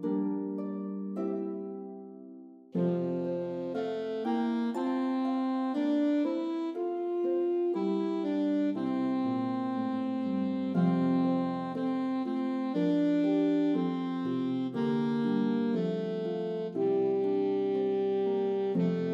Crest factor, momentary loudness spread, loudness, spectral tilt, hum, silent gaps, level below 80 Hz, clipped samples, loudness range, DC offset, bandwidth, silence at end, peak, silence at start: 12 dB; 7 LU; -31 LUFS; -9 dB/octave; none; none; -80 dBFS; under 0.1%; 5 LU; under 0.1%; 7.4 kHz; 0 s; -18 dBFS; 0 s